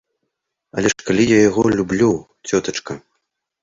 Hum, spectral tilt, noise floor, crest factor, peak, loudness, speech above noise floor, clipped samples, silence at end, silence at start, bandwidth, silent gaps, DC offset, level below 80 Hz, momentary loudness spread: none; -5 dB/octave; -76 dBFS; 18 dB; -2 dBFS; -17 LUFS; 60 dB; under 0.1%; 0.65 s; 0.75 s; 7.8 kHz; none; under 0.1%; -48 dBFS; 15 LU